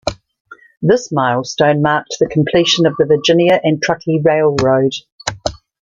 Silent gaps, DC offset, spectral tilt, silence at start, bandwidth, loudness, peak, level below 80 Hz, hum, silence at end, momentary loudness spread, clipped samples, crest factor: 0.40-0.45 s, 5.12-5.19 s; under 0.1%; -5 dB/octave; 0.05 s; 8.8 kHz; -14 LUFS; 0 dBFS; -44 dBFS; none; 0.25 s; 10 LU; under 0.1%; 14 dB